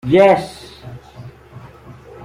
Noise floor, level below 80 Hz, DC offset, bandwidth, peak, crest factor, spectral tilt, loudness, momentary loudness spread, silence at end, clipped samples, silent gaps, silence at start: -39 dBFS; -48 dBFS; under 0.1%; 13.5 kHz; -2 dBFS; 16 dB; -7 dB/octave; -13 LUFS; 27 LU; 0 s; under 0.1%; none; 0.05 s